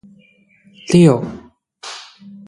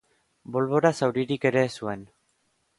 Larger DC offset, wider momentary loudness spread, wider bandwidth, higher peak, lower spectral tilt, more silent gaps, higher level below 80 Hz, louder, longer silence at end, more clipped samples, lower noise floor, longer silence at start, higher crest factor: neither; first, 25 LU vs 12 LU; about the same, 11.5 kHz vs 11.5 kHz; first, 0 dBFS vs -6 dBFS; about the same, -7 dB/octave vs -6 dB/octave; neither; first, -54 dBFS vs -66 dBFS; first, -13 LUFS vs -25 LUFS; second, 0.45 s vs 0.75 s; neither; second, -52 dBFS vs -71 dBFS; first, 0.9 s vs 0.5 s; about the same, 18 dB vs 20 dB